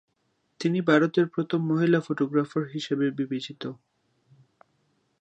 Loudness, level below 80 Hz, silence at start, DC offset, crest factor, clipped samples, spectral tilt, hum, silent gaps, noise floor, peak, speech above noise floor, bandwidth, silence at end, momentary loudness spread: -26 LUFS; -78 dBFS; 0.6 s; under 0.1%; 20 dB; under 0.1%; -7 dB/octave; none; none; -73 dBFS; -6 dBFS; 48 dB; 8.4 kHz; 1.45 s; 11 LU